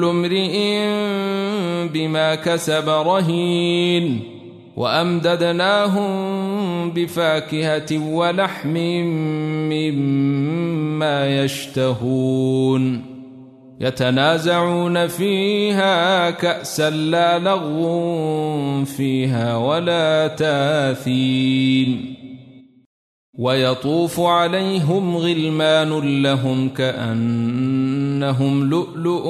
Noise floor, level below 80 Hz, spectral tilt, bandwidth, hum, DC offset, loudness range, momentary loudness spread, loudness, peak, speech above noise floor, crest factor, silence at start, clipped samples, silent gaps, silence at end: -44 dBFS; -60 dBFS; -6 dB/octave; 13.5 kHz; none; under 0.1%; 3 LU; 6 LU; -19 LUFS; -2 dBFS; 26 dB; 16 dB; 0 s; under 0.1%; 22.86-23.33 s; 0 s